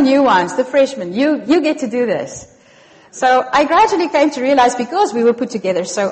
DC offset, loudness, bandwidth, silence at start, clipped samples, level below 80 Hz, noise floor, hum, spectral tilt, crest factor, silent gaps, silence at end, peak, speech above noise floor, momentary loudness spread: under 0.1%; -15 LUFS; 8.8 kHz; 0 s; under 0.1%; -54 dBFS; -46 dBFS; none; -4 dB/octave; 14 dB; none; 0 s; -2 dBFS; 31 dB; 7 LU